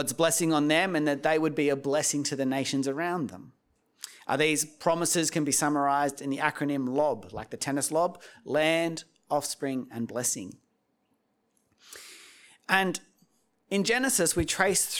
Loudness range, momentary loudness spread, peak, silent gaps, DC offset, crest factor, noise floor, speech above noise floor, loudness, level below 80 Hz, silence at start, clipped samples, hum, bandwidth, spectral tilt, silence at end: 8 LU; 14 LU; -6 dBFS; none; under 0.1%; 24 dB; -74 dBFS; 46 dB; -27 LUFS; -58 dBFS; 0 s; under 0.1%; none; 19.5 kHz; -3 dB/octave; 0 s